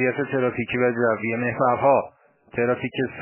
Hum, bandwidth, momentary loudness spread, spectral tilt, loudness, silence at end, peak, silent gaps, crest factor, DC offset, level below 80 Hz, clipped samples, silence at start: none; 3.2 kHz; 7 LU; -10.5 dB/octave; -23 LUFS; 0 s; -6 dBFS; none; 16 dB; under 0.1%; -58 dBFS; under 0.1%; 0 s